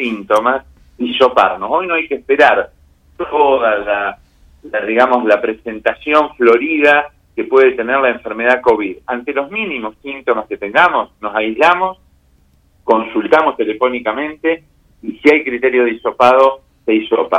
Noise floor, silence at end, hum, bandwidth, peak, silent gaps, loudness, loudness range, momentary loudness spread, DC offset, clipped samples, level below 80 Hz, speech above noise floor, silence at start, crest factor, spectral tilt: -52 dBFS; 0 s; none; 10.5 kHz; 0 dBFS; none; -14 LUFS; 3 LU; 11 LU; under 0.1%; under 0.1%; -50 dBFS; 39 dB; 0 s; 14 dB; -5 dB/octave